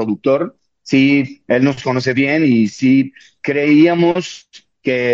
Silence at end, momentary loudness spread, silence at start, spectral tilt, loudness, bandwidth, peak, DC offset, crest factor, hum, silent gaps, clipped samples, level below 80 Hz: 0 s; 13 LU; 0 s; -6.5 dB/octave; -15 LUFS; 7.6 kHz; -2 dBFS; under 0.1%; 14 dB; none; none; under 0.1%; -60 dBFS